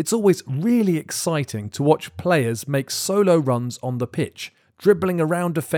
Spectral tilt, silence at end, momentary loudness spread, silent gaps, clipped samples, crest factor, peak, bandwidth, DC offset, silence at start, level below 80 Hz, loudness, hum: -5.5 dB/octave; 0 s; 9 LU; none; under 0.1%; 18 dB; -4 dBFS; over 20 kHz; under 0.1%; 0 s; -62 dBFS; -21 LUFS; none